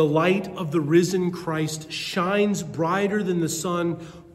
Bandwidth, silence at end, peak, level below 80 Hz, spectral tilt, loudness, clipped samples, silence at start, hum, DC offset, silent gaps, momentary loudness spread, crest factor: 14 kHz; 0.05 s; -8 dBFS; -58 dBFS; -5.5 dB/octave; -24 LUFS; under 0.1%; 0 s; none; under 0.1%; none; 8 LU; 16 dB